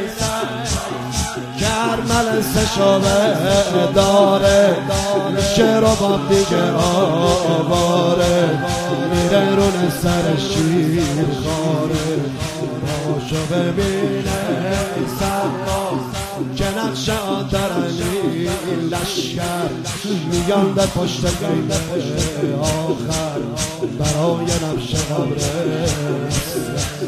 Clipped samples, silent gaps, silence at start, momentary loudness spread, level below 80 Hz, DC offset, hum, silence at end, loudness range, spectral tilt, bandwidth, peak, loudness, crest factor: under 0.1%; none; 0 s; 8 LU; -34 dBFS; under 0.1%; none; 0 s; 6 LU; -5 dB/octave; 15.5 kHz; 0 dBFS; -18 LUFS; 18 dB